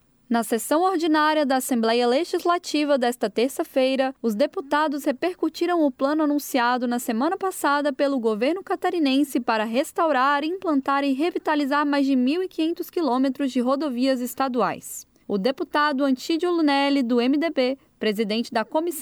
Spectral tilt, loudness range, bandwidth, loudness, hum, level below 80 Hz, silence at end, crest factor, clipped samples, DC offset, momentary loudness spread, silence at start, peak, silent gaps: -4 dB/octave; 2 LU; over 20 kHz; -23 LUFS; none; -70 dBFS; 0 s; 14 dB; under 0.1%; under 0.1%; 5 LU; 0.3 s; -8 dBFS; none